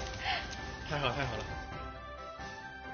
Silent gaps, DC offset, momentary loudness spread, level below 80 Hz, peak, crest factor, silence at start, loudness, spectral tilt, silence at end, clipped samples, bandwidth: none; under 0.1%; 11 LU; -48 dBFS; -16 dBFS; 22 dB; 0 s; -38 LUFS; -2.5 dB/octave; 0 s; under 0.1%; 7 kHz